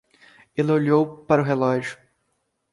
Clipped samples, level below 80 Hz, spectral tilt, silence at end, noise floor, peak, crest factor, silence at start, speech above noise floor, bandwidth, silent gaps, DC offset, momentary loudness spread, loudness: under 0.1%; -62 dBFS; -8 dB/octave; 0.8 s; -73 dBFS; -4 dBFS; 18 dB; 0.55 s; 53 dB; 11.5 kHz; none; under 0.1%; 10 LU; -22 LUFS